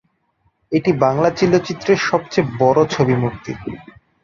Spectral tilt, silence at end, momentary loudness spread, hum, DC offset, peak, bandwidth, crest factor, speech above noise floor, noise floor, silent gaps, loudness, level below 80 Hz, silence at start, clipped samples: -6.5 dB/octave; 0.4 s; 14 LU; none; under 0.1%; -2 dBFS; 7.4 kHz; 16 dB; 47 dB; -64 dBFS; none; -17 LUFS; -50 dBFS; 0.7 s; under 0.1%